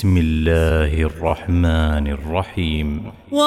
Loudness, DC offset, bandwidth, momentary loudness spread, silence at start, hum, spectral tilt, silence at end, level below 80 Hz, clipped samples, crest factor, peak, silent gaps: -19 LUFS; under 0.1%; 13 kHz; 6 LU; 0 s; none; -7 dB/octave; 0 s; -24 dBFS; under 0.1%; 14 dB; -4 dBFS; none